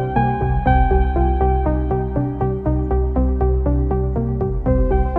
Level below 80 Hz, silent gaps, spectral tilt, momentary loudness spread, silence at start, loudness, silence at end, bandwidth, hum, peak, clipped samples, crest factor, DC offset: -20 dBFS; none; -11.5 dB/octave; 4 LU; 0 s; -19 LUFS; 0 s; 4 kHz; none; -4 dBFS; under 0.1%; 14 dB; under 0.1%